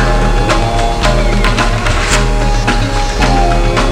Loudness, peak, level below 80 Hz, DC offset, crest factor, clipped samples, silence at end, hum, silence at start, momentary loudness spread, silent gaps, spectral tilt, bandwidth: -13 LUFS; 0 dBFS; -14 dBFS; under 0.1%; 10 dB; under 0.1%; 0 s; none; 0 s; 2 LU; none; -4.5 dB/octave; 12 kHz